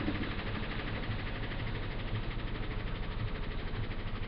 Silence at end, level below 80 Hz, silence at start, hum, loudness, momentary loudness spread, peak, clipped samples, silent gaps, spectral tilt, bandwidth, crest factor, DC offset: 0 s; -38 dBFS; 0 s; none; -39 LUFS; 3 LU; -22 dBFS; under 0.1%; none; -4.5 dB/octave; 5.4 kHz; 14 dB; under 0.1%